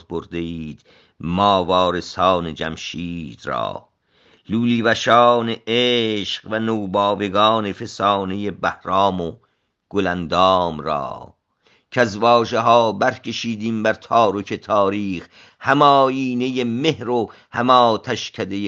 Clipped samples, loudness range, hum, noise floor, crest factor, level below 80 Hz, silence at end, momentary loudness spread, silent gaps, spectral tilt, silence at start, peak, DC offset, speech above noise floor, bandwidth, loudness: under 0.1%; 3 LU; none; -60 dBFS; 20 dB; -56 dBFS; 0 s; 13 LU; none; -5.5 dB/octave; 0.1 s; 0 dBFS; under 0.1%; 41 dB; 7.8 kHz; -19 LUFS